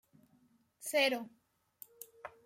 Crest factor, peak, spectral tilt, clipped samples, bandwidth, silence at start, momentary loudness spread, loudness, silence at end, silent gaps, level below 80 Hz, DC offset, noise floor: 22 dB; -18 dBFS; -1 dB/octave; under 0.1%; 16.5 kHz; 0.8 s; 24 LU; -34 LUFS; 0.15 s; none; -88 dBFS; under 0.1%; -71 dBFS